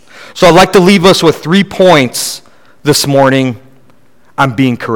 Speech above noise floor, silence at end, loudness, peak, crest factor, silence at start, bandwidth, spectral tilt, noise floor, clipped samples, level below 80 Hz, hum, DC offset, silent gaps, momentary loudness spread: 41 dB; 0 s; -8 LUFS; 0 dBFS; 10 dB; 0.15 s; 19.5 kHz; -4.5 dB/octave; -48 dBFS; 3%; -40 dBFS; none; under 0.1%; none; 13 LU